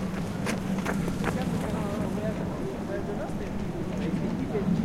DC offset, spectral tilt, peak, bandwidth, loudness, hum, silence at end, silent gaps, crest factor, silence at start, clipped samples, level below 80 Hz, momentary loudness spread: under 0.1%; -7 dB/octave; -12 dBFS; 16 kHz; -31 LUFS; none; 0 s; none; 18 dB; 0 s; under 0.1%; -44 dBFS; 4 LU